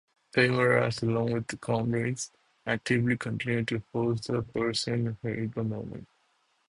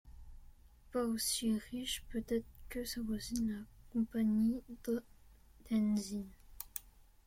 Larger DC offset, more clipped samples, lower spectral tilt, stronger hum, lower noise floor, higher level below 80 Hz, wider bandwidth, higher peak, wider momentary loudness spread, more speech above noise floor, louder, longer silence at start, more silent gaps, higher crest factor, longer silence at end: neither; neither; about the same, -5.5 dB/octave vs -4.5 dB/octave; neither; first, -71 dBFS vs -61 dBFS; about the same, -60 dBFS vs -56 dBFS; second, 11 kHz vs 16.5 kHz; first, -10 dBFS vs -18 dBFS; about the same, 10 LU vs 12 LU; first, 42 dB vs 25 dB; first, -29 LUFS vs -38 LUFS; first, 0.35 s vs 0.05 s; neither; about the same, 20 dB vs 20 dB; first, 0.65 s vs 0.35 s